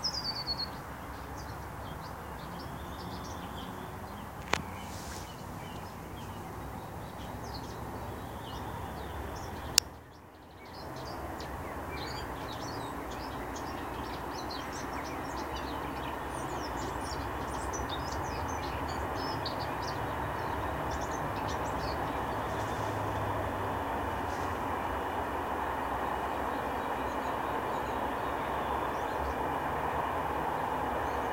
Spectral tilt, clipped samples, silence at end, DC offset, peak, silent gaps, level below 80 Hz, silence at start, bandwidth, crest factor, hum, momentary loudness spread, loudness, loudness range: -4 dB/octave; under 0.1%; 0 s; under 0.1%; 0 dBFS; none; -48 dBFS; 0 s; 16 kHz; 36 dB; none; 9 LU; -36 LUFS; 7 LU